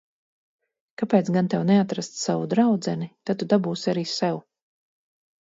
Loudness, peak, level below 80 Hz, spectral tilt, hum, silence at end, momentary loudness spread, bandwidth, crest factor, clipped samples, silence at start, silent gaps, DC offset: -24 LUFS; -6 dBFS; -70 dBFS; -6 dB/octave; none; 1 s; 9 LU; 7.8 kHz; 20 dB; under 0.1%; 1 s; none; under 0.1%